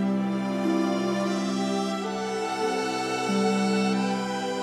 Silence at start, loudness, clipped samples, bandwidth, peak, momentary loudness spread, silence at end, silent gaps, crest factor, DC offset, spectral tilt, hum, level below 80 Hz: 0 s; -26 LUFS; under 0.1%; 13 kHz; -14 dBFS; 5 LU; 0 s; none; 12 dB; under 0.1%; -5.5 dB/octave; none; -66 dBFS